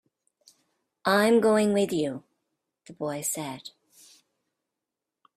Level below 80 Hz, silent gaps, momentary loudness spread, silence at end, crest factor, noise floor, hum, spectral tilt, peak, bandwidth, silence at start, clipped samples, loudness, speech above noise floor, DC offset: -72 dBFS; none; 20 LU; 1.7 s; 20 dB; -87 dBFS; none; -4.5 dB/octave; -8 dBFS; 15.5 kHz; 1.05 s; under 0.1%; -25 LUFS; 62 dB; under 0.1%